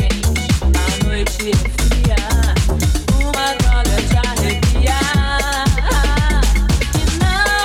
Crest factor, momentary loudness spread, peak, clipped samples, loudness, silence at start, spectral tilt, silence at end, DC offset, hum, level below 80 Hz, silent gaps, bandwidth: 12 dB; 2 LU; -2 dBFS; under 0.1%; -16 LUFS; 0 s; -4.5 dB/octave; 0 s; under 0.1%; none; -16 dBFS; none; 16 kHz